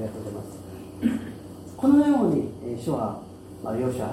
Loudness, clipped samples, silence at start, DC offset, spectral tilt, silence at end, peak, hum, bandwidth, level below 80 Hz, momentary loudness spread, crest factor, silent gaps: -25 LUFS; under 0.1%; 0 s; under 0.1%; -7.5 dB/octave; 0 s; -8 dBFS; none; 14 kHz; -56 dBFS; 21 LU; 16 dB; none